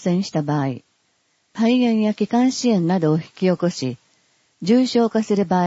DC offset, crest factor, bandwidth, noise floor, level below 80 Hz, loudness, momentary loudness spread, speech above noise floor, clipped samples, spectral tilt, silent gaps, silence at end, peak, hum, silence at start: under 0.1%; 14 dB; 8 kHz; -66 dBFS; -64 dBFS; -20 LUFS; 11 LU; 47 dB; under 0.1%; -6.5 dB/octave; none; 0 s; -6 dBFS; none; 0 s